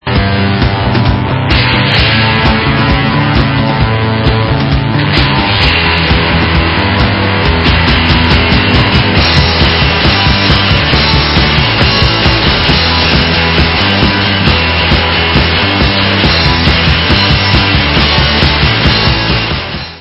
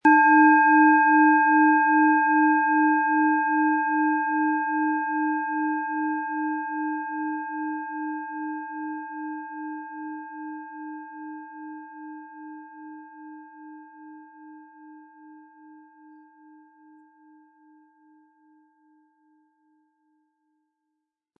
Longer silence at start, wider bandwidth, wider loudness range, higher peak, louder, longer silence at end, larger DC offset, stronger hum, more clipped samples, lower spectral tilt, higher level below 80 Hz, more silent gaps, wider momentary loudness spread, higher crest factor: about the same, 0.05 s vs 0.05 s; first, 8 kHz vs 2.7 kHz; second, 2 LU vs 25 LU; first, 0 dBFS vs -6 dBFS; first, -8 LUFS vs -22 LUFS; second, 0 s vs 6.05 s; neither; neither; first, 0.4% vs under 0.1%; about the same, -7 dB/octave vs -6.5 dB/octave; first, -18 dBFS vs -88 dBFS; neither; second, 3 LU vs 25 LU; second, 8 dB vs 18 dB